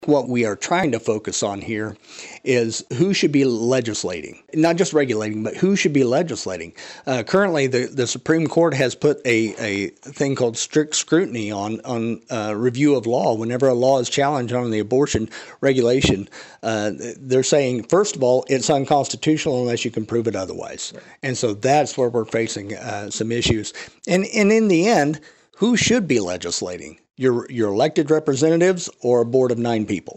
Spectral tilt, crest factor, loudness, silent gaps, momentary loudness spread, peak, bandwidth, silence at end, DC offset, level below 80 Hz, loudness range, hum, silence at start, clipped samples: -4.5 dB/octave; 14 dB; -20 LUFS; none; 11 LU; -6 dBFS; 10 kHz; 0.05 s; under 0.1%; -50 dBFS; 3 LU; none; 0 s; under 0.1%